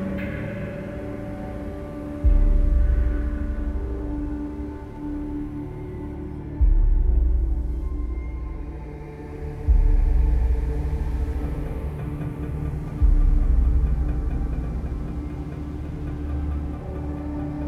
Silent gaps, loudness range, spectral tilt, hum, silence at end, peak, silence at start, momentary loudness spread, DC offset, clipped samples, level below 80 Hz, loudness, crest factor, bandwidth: none; 4 LU; -9.5 dB/octave; none; 0 s; -8 dBFS; 0 s; 11 LU; under 0.1%; under 0.1%; -24 dBFS; -27 LUFS; 16 dB; 3.5 kHz